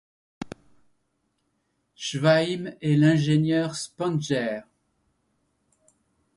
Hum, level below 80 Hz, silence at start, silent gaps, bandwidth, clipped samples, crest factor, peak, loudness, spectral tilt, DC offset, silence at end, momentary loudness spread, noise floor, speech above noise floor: none; -66 dBFS; 0.4 s; none; 11.5 kHz; under 0.1%; 18 dB; -8 dBFS; -24 LUFS; -6 dB/octave; under 0.1%; 1.75 s; 20 LU; -74 dBFS; 51 dB